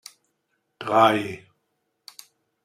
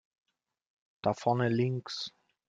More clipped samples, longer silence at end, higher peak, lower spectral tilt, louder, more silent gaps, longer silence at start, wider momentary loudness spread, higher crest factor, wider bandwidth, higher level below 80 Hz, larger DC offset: neither; first, 1.3 s vs 0.4 s; first, -4 dBFS vs -14 dBFS; second, -5 dB/octave vs -6.5 dB/octave; first, -20 LUFS vs -32 LUFS; neither; second, 0.8 s vs 1.05 s; first, 26 LU vs 10 LU; about the same, 22 dB vs 20 dB; first, 16 kHz vs 7.8 kHz; about the same, -70 dBFS vs -72 dBFS; neither